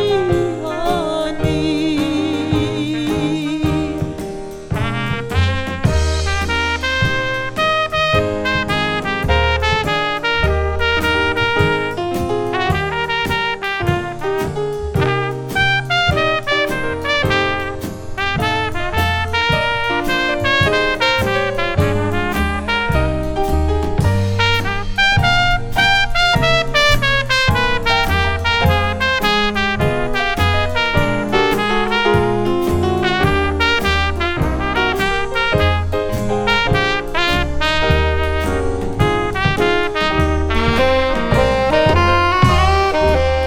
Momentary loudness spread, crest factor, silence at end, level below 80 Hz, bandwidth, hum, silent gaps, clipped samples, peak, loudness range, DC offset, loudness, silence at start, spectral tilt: 6 LU; 16 dB; 0 s; -28 dBFS; 18.5 kHz; none; none; under 0.1%; 0 dBFS; 4 LU; under 0.1%; -16 LUFS; 0 s; -5 dB/octave